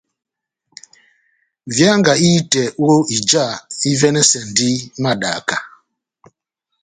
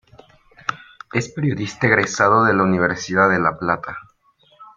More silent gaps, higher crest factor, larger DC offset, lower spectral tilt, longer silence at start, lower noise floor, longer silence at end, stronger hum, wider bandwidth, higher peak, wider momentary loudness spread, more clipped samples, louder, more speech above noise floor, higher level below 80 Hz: neither; about the same, 18 dB vs 18 dB; neither; second, -3.5 dB/octave vs -5.5 dB/octave; first, 1.65 s vs 0.7 s; first, -75 dBFS vs -57 dBFS; first, 1.15 s vs 0.1 s; neither; first, 9.6 kHz vs 7.6 kHz; about the same, 0 dBFS vs -2 dBFS; second, 9 LU vs 14 LU; neither; first, -15 LUFS vs -18 LUFS; first, 60 dB vs 39 dB; about the same, -56 dBFS vs -54 dBFS